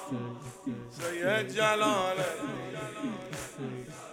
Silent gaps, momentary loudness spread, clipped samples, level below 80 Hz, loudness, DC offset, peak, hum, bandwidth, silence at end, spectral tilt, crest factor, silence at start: none; 13 LU; under 0.1%; -66 dBFS; -32 LUFS; under 0.1%; -12 dBFS; none; 18.5 kHz; 0 s; -4 dB/octave; 20 dB; 0 s